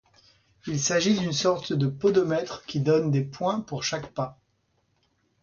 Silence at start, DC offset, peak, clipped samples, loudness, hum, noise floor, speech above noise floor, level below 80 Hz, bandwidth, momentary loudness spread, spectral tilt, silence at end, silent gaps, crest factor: 0.65 s; under 0.1%; -10 dBFS; under 0.1%; -26 LUFS; none; -71 dBFS; 46 dB; -62 dBFS; 7.2 kHz; 10 LU; -5 dB/octave; 1.1 s; none; 18 dB